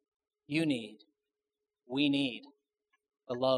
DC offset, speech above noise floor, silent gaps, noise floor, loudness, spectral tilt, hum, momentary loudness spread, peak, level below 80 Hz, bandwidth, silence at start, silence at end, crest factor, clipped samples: under 0.1%; over 58 dB; none; under -90 dBFS; -33 LUFS; -6 dB/octave; none; 14 LU; -16 dBFS; -82 dBFS; 11 kHz; 0.5 s; 0 s; 20 dB; under 0.1%